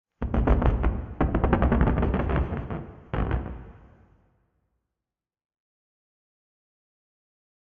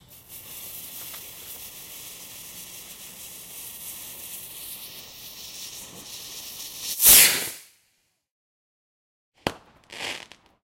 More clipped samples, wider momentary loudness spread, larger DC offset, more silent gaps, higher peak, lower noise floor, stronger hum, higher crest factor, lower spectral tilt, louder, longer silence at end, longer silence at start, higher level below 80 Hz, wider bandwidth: neither; second, 12 LU vs 21 LU; neither; second, none vs 8.31-9.32 s; second, -4 dBFS vs 0 dBFS; first, -89 dBFS vs -70 dBFS; neither; about the same, 24 dB vs 28 dB; first, -8 dB/octave vs 0.5 dB/octave; second, -26 LUFS vs -18 LUFS; first, 3.95 s vs 0.35 s; about the same, 0.2 s vs 0.1 s; first, -30 dBFS vs -58 dBFS; second, 3.7 kHz vs 16.5 kHz